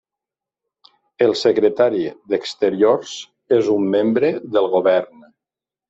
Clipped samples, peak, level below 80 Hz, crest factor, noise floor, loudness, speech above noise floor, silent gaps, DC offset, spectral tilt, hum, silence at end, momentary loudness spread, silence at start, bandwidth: under 0.1%; -4 dBFS; -66 dBFS; 16 dB; -88 dBFS; -18 LUFS; 71 dB; none; under 0.1%; -5.5 dB/octave; none; 0.85 s; 8 LU; 1.2 s; 8 kHz